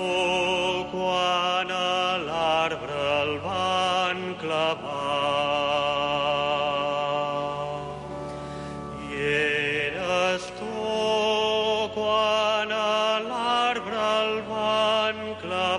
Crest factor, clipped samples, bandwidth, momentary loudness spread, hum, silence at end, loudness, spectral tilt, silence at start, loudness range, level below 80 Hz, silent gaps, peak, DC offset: 14 dB; under 0.1%; 11.5 kHz; 8 LU; none; 0 s; -25 LUFS; -3.5 dB/octave; 0 s; 4 LU; -54 dBFS; none; -12 dBFS; under 0.1%